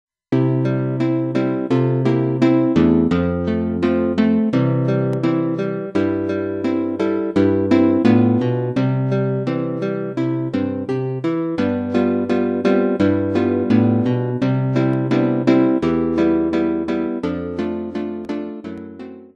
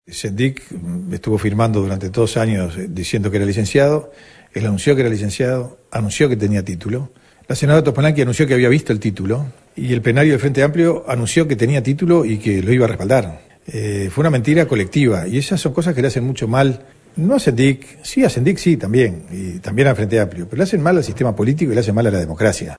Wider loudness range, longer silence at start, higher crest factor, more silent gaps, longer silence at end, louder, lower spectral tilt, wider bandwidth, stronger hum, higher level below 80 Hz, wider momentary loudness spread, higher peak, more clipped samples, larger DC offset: about the same, 4 LU vs 3 LU; first, 0.3 s vs 0.1 s; about the same, 16 dB vs 16 dB; neither; about the same, 0.1 s vs 0 s; about the same, -18 LUFS vs -17 LUFS; first, -9 dB/octave vs -6.5 dB/octave; second, 7.4 kHz vs 11 kHz; neither; about the same, -48 dBFS vs -44 dBFS; about the same, 8 LU vs 10 LU; about the same, -2 dBFS vs 0 dBFS; neither; neither